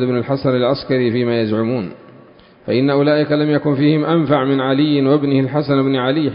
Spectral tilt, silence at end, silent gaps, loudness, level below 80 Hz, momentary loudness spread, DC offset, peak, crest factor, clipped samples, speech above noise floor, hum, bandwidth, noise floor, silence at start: -12.5 dB/octave; 0 s; none; -16 LUFS; -54 dBFS; 4 LU; under 0.1%; -2 dBFS; 14 dB; under 0.1%; 29 dB; none; 5.4 kHz; -44 dBFS; 0 s